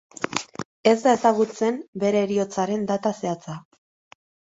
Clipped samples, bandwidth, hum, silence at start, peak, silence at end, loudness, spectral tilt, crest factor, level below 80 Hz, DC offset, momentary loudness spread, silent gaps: under 0.1%; 8 kHz; none; 0.2 s; -2 dBFS; 0.95 s; -23 LUFS; -5 dB/octave; 22 dB; -66 dBFS; under 0.1%; 13 LU; 0.65-0.83 s, 1.88-1.93 s